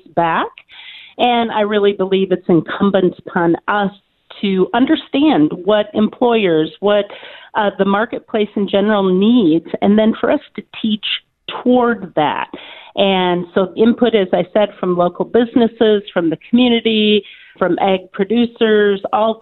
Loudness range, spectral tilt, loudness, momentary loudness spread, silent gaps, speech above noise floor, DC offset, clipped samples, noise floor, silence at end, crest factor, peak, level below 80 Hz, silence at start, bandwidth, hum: 2 LU; -9.5 dB/octave; -15 LUFS; 8 LU; none; 23 dB; under 0.1%; under 0.1%; -37 dBFS; 0.05 s; 14 dB; 0 dBFS; -54 dBFS; 0.15 s; 4.3 kHz; none